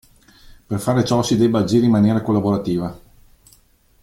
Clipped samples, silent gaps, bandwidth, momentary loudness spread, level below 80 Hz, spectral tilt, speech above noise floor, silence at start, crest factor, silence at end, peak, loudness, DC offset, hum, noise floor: under 0.1%; none; 15.5 kHz; 9 LU; -48 dBFS; -6.5 dB/octave; 38 dB; 0.7 s; 16 dB; 1.05 s; -4 dBFS; -18 LUFS; under 0.1%; none; -54 dBFS